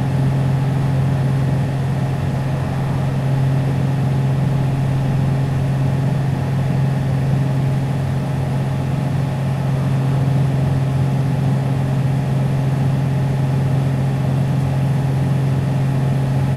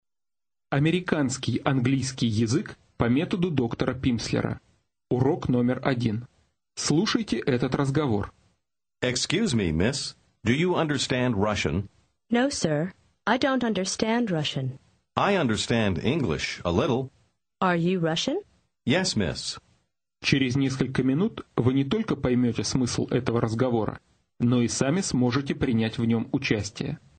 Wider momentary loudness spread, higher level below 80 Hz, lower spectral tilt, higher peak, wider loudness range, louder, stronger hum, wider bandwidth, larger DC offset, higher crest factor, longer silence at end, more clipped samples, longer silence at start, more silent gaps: second, 2 LU vs 8 LU; first, -38 dBFS vs -50 dBFS; first, -8 dB/octave vs -5.5 dB/octave; about the same, -6 dBFS vs -6 dBFS; about the same, 1 LU vs 2 LU; first, -18 LUFS vs -26 LUFS; neither; first, 12 kHz vs 9.4 kHz; neither; second, 10 dB vs 20 dB; second, 0 s vs 0.2 s; neither; second, 0 s vs 0.7 s; neither